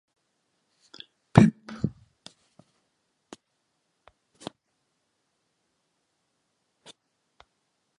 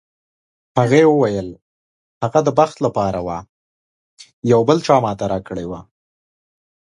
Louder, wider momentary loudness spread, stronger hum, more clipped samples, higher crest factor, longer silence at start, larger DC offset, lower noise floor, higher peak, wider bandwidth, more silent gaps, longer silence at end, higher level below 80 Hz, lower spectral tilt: second, -23 LUFS vs -17 LUFS; first, 28 LU vs 15 LU; neither; neither; first, 32 dB vs 18 dB; first, 1.35 s vs 0.75 s; neither; second, -77 dBFS vs under -90 dBFS; about the same, 0 dBFS vs 0 dBFS; about the same, 11 kHz vs 10.5 kHz; second, none vs 1.62-2.21 s, 3.49-4.17 s, 4.33-4.42 s; first, 6.1 s vs 1.05 s; about the same, -52 dBFS vs -50 dBFS; about the same, -7.5 dB/octave vs -6.5 dB/octave